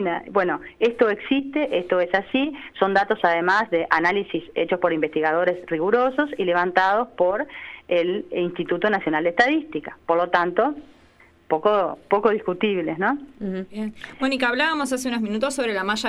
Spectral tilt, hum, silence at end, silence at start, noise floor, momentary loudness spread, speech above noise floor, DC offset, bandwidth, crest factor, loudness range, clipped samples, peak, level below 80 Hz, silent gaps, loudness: -5 dB/octave; none; 0 s; 0 s; -54 dBFS; 8 LU; 32 dB; under 0.1%; 13.5 kHz; 18 dB; 3 LU; under 0.1%; -4 dBFS; -58 dBFS; none; -22 LUFS